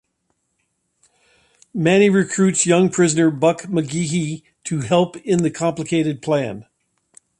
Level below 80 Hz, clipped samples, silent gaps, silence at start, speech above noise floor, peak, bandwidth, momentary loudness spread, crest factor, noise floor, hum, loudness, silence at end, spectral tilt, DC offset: -60 dBFS; under 0.1%; none; 1.75 s; 53 dB; -2 dBFS; 11.5 kHz; 12 LU; 18 dB; -71 dBFS; none; -18 LUFS; 0.75 s; -5 dB/octave; under 0.1%